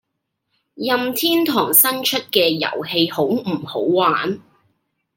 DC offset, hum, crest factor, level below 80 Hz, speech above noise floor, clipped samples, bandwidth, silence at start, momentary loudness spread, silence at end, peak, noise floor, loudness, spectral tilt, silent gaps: under 0.1%; none; 20 dB; -68 dBFS; 57 dB; under 0.1%; 17 kHz; 0.75 s; 10 LU; 0.75 s; 0 dBFS; -75 dBFS; -17 LUFS; -3 dB/octave; none